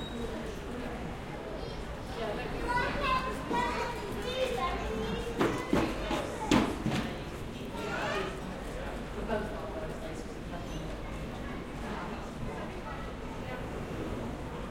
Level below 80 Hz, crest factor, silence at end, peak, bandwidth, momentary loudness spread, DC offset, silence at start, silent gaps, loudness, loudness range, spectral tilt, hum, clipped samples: -44 dBFS; 24 dB; 0 s; -12 dBFS; 16.5 kHz; 10 LU; under 0.1%; 0 s; none; -35 LUFS; 8 LU; -5.5 dB/octave; none; under 0.1%